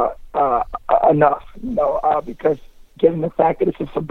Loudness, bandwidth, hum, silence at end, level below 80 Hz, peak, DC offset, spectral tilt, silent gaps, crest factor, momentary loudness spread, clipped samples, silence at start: -19 LUFS; 6 kHz; none; 0.05 s; -42 dBFS; -2 dBFS; under 0.1%; -9 dB/octave; none; 16 dB; 8 LU; under 0.1%; 0 s